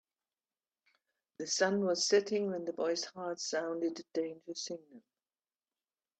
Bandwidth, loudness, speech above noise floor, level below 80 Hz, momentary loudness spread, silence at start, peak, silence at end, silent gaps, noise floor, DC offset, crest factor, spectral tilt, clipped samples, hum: 9 kHz; -34 LUFS; over 55 dB; -86 dBFS; 12 LU; 1.4 s; -16 dBFS; 1.2 s; none; under -90 dBFS; under 0.1%; 22 dB; -3 dB/octave; under 0.1%; none